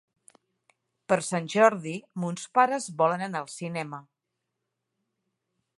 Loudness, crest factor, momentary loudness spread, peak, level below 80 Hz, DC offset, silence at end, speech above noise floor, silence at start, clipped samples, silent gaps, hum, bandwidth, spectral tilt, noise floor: -27 LUFS; 24 dB; 13 LU; -4 dBFS; -80 dBFS; under 0.1%; 1.75 s; 57 dB; 1.1 s; under 0.1%; none; none; 11.5 kHz; -5 dB/octave; -83 dBFS